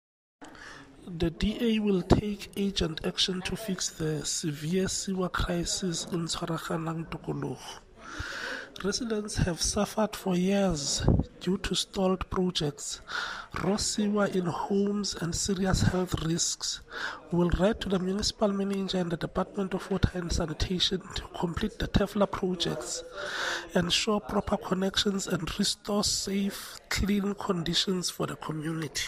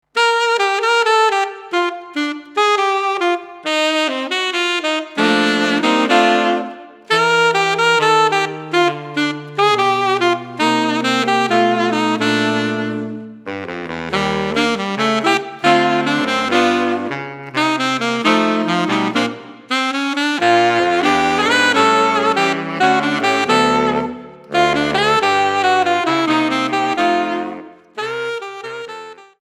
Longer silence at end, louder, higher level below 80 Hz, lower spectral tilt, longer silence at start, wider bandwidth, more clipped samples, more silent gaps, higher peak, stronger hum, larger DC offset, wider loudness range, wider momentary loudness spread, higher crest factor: second, 0 s vs 0.2 s; second, -29 LUFS vs -16 LUFS; first, -42 dBFS vs -56 dBFS; about the same, -4 dB/octave vs -4 dB/octave; first, 0.4 s vs 0.15 s; about the same, 15.5 kHz vs 15 kHz; neither; neither; second, -6 dBFS vs 0 dBFS; neither; neither; about the same, 3 LU vs 4 LU; about the same, 8 LU vs 10 LU; first, 22 dB vs 16 dB